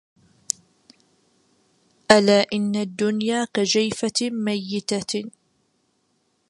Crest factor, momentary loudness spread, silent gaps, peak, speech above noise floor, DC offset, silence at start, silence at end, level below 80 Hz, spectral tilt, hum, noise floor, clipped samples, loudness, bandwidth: 24 dB; 13 LU; none; 0 dBFS; 47 dB; under 0.1%; 2.1 s; 1.2 s; -62 dBFS; -3.5 dB/octave; none; -69 dBFS; under 0.1%; -22 LUFS; 11.5 kHz